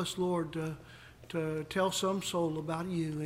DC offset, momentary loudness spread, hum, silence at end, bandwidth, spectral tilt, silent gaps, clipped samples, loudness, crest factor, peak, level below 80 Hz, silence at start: under 0.1%; 11 LU; none; 0 s; 16.5 kHz; -5 dB/octave; none; under 0.1%; -34 LUFS; 16 dB; -18 dBFS; -62 dBFS; 0 s